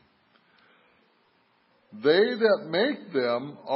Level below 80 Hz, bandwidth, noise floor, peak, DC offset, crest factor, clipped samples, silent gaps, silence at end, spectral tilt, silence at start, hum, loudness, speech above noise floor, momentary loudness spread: -84 dBFS; 5.8 kHz; -66 dBFS; -8 dBFS; under 0.1%; 20 dB; under 0.1%; none; 0 s; -9 dB/octave; 1.95 s; none; -25 LUFS; 41 dB; 7 LU